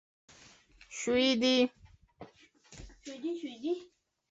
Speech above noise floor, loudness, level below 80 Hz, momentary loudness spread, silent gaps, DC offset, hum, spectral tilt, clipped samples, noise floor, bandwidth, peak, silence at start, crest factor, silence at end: 29 dB; -31 LUFS; -62 dBFS; 26 LU; none; under 0.1%; none; -3 dB/octave; under 0.1%; -59 dBFS; 8 kHz; -16 dBFS; 0.9 s; 18 dB; 0.45 s